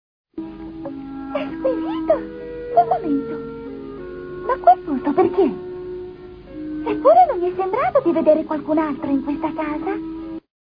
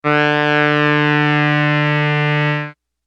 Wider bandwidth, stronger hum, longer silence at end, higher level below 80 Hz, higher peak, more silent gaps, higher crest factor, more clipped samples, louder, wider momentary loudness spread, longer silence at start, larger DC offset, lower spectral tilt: second, 5.2 kHz vs 7 kHz; neither; about the same, 0.25 s vs 0.35 s; first, -48 dBFS vs -66 dBFS; about the same, -2 dBFS vs -2 dBFS; neither; about the same, 18 dB vs 14 dB; neither; second, -20 LUFS vs -15 LUFS; first, 17 LU vs 4 LU; first, 0.35 s vs 0.05 s; neither; first, -9.5 dB/octave vs -7 dB/octave